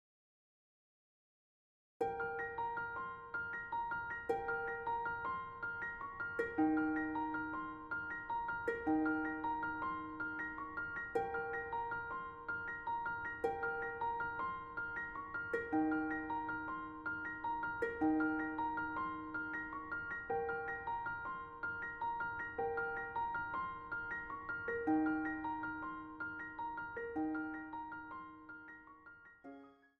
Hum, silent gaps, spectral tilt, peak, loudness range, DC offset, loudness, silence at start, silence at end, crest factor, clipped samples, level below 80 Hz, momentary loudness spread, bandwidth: none; none; -7.5 dB/octave; -24 dBFS; 4 LU; under 0.1%; -41 LUFS; 2 s; 0.25 s; 18 dB; under 0.1%; -66 dBFS; 9 LU; 7 kHz